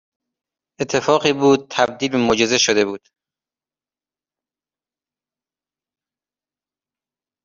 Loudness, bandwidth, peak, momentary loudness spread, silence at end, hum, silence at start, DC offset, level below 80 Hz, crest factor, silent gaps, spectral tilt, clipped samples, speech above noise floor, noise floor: -17 LUFS; 7.6 kHz; -2 dBFS; 8 LU; 4.45 s; none; 0.8 s; under 0.1%; -58 dBFS; 20 dB; none; -3.5 dB/octave; under 0.1%; over 73 dB; under -90 dBFS